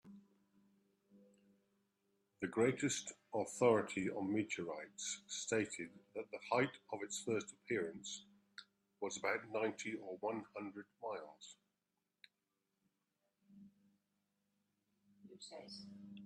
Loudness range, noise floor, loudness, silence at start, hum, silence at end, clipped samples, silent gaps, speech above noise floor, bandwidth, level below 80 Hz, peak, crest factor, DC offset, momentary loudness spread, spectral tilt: 16 LU; -89 dBFS; -41 LUFS; 0.05 s; none; 0 s; under 0.1%; none; 48 dB; 13 kHz; -86 dBFS; -20 dBFS; 24 dB; under 0.1%; 18 LU; -4 dB/octave